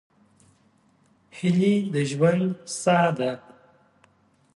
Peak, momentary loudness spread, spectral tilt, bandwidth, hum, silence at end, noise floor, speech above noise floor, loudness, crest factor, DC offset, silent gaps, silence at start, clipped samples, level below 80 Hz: -8 dBFS; 8 LU; -6 dB/octave; 11.5 kHz; none; 1.15 s; -62 dBFS; 40 dB; -23 LUFS; 18 dB; under 0.1%; none; 1.35 s; under 0.1%; -68 dBFS